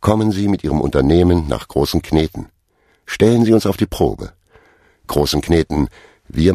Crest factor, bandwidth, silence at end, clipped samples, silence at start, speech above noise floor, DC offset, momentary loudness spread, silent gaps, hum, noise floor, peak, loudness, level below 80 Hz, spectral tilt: 16 dB; 15 kHz; 0 s; under 0.1%; 0 s; 44 dB; under 0.1%; 11 LU; none; none; -59 dBFS; 0 dBFS; -16 LUFS; -30 dBFS; -6.5 dB/octave